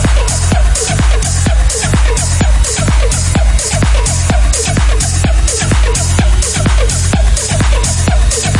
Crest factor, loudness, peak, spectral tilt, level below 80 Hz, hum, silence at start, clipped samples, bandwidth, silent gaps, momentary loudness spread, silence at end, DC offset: 10 dB; -12 LUFS; 0 dBFS; -4 dB/octave; -12 dBFS; none; 0 s; under 0.1%; 11.5 kHz; none; 1 LU; 0 s; under 0.1%